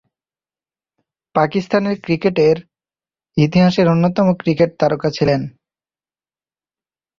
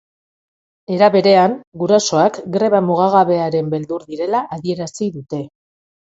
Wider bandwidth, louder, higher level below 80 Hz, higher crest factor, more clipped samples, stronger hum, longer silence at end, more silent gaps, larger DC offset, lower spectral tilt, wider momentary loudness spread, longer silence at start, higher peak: second, 7.2 kHz vs 8 kHz; about the same, -16 LUFS vs -16 LUFS; first, -50 dBFS vs -60 dBFS; about the same, 18 dB vs 16 dB; neither; neither; first, 1.7 s vs 0.65 s; second, none vs 1.67-1.72 s; neither; first, -7.5 dB/octave vs -5.5 dB/octave; second, 8 LU vs 13 LU; first, 1.35 s vs 0.9 s; about the same, 0 dBFS vs 0 dBFS